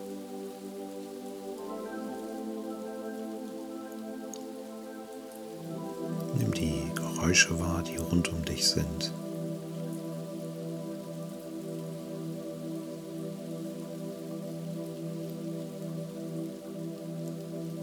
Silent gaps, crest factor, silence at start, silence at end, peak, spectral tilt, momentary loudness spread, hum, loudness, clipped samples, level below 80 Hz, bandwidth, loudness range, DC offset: none; 26 dB; 0 s; 0 s; -8 dBFS; -4 dB/octave; 12 LU; none; -34 LUFS; under 0.1%; -54 dBFS; over 20 kHz; 11 LU; under 0.1%